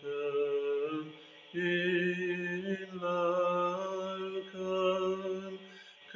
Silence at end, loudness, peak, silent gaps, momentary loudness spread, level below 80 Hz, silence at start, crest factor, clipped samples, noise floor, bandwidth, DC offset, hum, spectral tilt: 0 s; -34 LUFS; -18 dBFS; none; 13 LU; -80 dBFS; 0 s; 16 dB; under 0.1%; -53 dBFS; 7.6 kHz; under 0.1%; none; -6 dB/octave